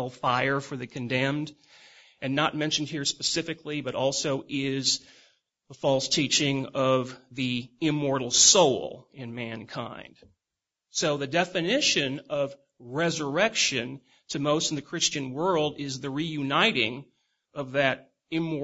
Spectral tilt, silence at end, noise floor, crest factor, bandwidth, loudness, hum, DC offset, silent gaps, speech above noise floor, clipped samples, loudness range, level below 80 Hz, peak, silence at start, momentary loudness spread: -3 dB/octave; 0 s; -88 dBFS; 22 dB; 8 kHz; -26 LUFS; none; under 0.1%; none; 61 dB; under 0.1%; 5 LU; -66 dBFS; -6 dBFS; 0 s; 14 LU